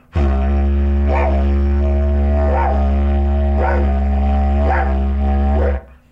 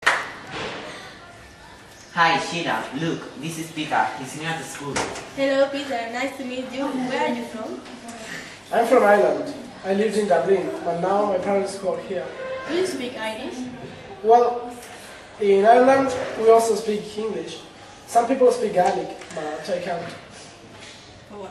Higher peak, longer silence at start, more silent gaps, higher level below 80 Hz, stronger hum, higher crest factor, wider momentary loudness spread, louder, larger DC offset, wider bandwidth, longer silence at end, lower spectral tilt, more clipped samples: about the same, -4 dBFS vs -2 dBFS; first, 0.15 s vs 0 s; neither; first, -16 dBFS vs -60 dBFS; neither; second, 10 dB vs 20 dB; second, 2 LU vs 21 LU; first, -17 LUFS vs -22 LUFS; neither; second, 3.8 kHz vs 13 kHz; first, 0.25 s vs 0 s; first, -10 dB/octave vs -4.5 dB/octave; neither